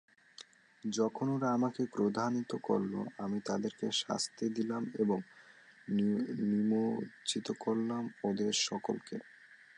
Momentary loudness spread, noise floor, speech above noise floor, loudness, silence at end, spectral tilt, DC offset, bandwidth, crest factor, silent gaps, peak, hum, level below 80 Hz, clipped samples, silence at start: 8 LU; -59 dBFS; 25 dB; -35 LUFS; 0.25 s; -5 dB/octave; under 0.1%; 11 kHz; 18 dB; none; -18 dBFS; none; -78 dBFS; under 0.1%; 0.4 s